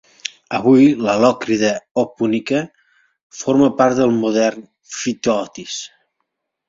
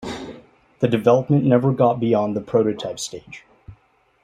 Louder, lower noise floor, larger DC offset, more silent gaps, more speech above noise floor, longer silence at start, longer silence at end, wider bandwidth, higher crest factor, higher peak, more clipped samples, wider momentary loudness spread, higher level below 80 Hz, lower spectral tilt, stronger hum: about the same, -17 LUFS vs -19 LUFS; first, -74 dBFS vs -58 dBFS; neither; first, 1.91-1.95 s, 3.23-3.30 s vs none; first, 58 dB vs 39 dB; first, 0.25 s vs 0 s; first, 0.8 s vs 0.5 s; second, 7.8 kHz vs 13.5 kHz; about the same, 16 dB vs 18 dB; about the same, -2 dBFS vs -2 dBFS; neither; second, 16 LU vs 20 LU; about the same, -58 dBFS vs -56 dBFS; second, -5 dB/octave vs -7 dB/octave; neither